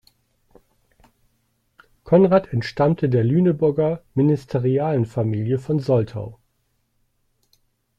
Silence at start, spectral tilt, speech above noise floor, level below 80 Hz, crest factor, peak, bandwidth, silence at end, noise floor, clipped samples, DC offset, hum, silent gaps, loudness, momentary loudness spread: 2.05 s; -9.5 dB/octave; 50 dB; -54 dBFS; 18 dB; -2 dBFS; 8 kHz; 1.65 s; -69 dBFS; under 0.1%; under 0.1%; none; none; -20 LUFS; 7 LU